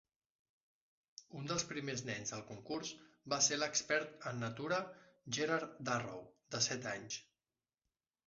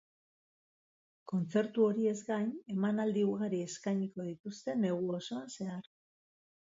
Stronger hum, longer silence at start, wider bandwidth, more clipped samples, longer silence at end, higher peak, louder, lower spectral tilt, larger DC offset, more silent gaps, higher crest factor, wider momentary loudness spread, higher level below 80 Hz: neither; about the same, 1.2 s vs 1.25 s; about the same, 7.6 kHz vs 7.8 kHz; neither; about the same, 1.05 s vs 0.95 s; about the same, -18 dBFS vs -18 dBFS; second, -39 LUFS vs -35 LUFS; second, -2.5 dB/octave vs -6.5 dB/octave; neither; second, none vs 4.40-4.44 s; first, 24 dB vs 18 dB; first, 17 LU vs 12 LU; about the same, -78 dBFS vs -82 dBFS